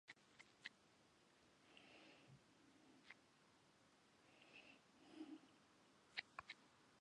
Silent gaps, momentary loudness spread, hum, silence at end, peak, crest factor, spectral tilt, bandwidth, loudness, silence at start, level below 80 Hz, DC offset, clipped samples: none; 14 LU; none; 0 s; -30 dBFS; 34 dB; -3 dB/octave; 10.5 kHz; -61 LUFS; 0.05 s; under -90 dBFS; under 0.1%; under 0.1%